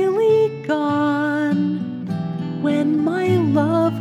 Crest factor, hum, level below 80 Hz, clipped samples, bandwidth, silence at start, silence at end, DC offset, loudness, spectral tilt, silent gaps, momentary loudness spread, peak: 12 dB; none; -68 dBFS; under 0.1%; 10.5 kHz; 0 s; 0 s; under 0.1%; -19 LUFS; -8 dB/octave; none; 9 LU; -6 dBFS